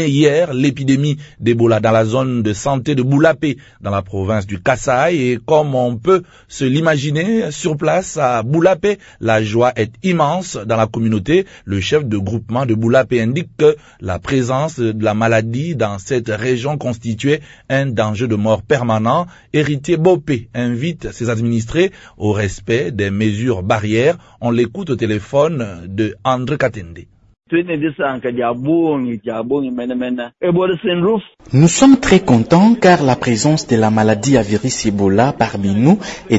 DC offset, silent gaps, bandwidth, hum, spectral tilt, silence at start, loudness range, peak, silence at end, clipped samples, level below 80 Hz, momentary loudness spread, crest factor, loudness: under 0.1%; none; 8 kHz; none; -6 dB/octave; 0 s; 6 LU; 0 dBFS; 0 s; under 0.1%; -44 dBFS; 8 LU; 16 dB; -16 LUFS